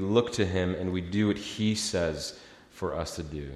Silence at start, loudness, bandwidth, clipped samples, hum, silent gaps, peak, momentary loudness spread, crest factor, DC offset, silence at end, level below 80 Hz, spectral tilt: 0 s; -30 LUFS; 13.5 kHz; under 0.1%; none; none; -10 dBFS; 10 LU; 18 dB; under 0.1%; 0 s; -52 dBFS; -5 dB/octave